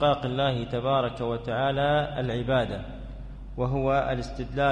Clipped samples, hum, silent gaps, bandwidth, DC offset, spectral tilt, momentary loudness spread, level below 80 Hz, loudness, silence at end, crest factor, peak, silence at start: under 0.1%; none; none; 9.6 kHz; under 0.1%; -7 dB/octave; 14 LU; -42 dBFS; -27 LUFS; 0 s; 16 dB; -12 dBFS; 0 s